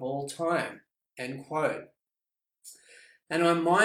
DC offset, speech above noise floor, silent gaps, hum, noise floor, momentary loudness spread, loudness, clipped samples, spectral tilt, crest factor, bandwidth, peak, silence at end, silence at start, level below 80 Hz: under 0.1%; over 62 dB; none; none; under -90 dBFS; 25 LU; -30 LUFS; under 0.1%; -5 dB/octave; 20 dB; 15 kHz; -10 dBFS; 0 s; 0 s; -76 dBFS